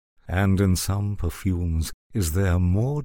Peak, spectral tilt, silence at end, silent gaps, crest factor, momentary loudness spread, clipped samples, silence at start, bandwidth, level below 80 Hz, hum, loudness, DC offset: -8 dBFS; -6 dB/octave; 0 s; 1.94-2.10 s; 14 dB; 7 LU; under 0.1%; 0.25 s; 18 kHz; -38 dBFS; none; -24 LUFS; under 0.1%